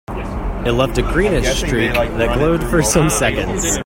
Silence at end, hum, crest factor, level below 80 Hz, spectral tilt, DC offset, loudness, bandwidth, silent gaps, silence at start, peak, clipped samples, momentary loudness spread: 0 s; none; 16 dB; -24 dBFS; -4.5 dB/octave; under 0.1%; -16 LUFS; 16.5 kHz; none; 0.1 s; 0 dBFS; under 0.1%; 7 LU